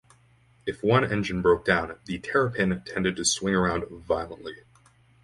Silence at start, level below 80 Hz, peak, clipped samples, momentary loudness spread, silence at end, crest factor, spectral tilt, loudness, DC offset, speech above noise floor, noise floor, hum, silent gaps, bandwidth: 0.65 s; -50 dBFS; -4 dBFS; under 0.1%; 12 LU; 0.7 s; 22 dB; -4.5 dB/octave; -26 LUFS; under 0.1%; 34 dB; -60 dBFS; none; none; 11.5 kHz